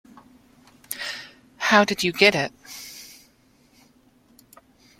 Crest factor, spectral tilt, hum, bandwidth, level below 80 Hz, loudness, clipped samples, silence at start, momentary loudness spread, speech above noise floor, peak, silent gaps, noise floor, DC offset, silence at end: 26 dB; -3.5 dB/octave; none; 16.5 kHz; -64 dBFS; -21 LUFS; under 0.1%; 0.9 s; 23 LU; 39 dB; -2 dBFS; none; -59 dBFS; under 0.1%; 1.95 s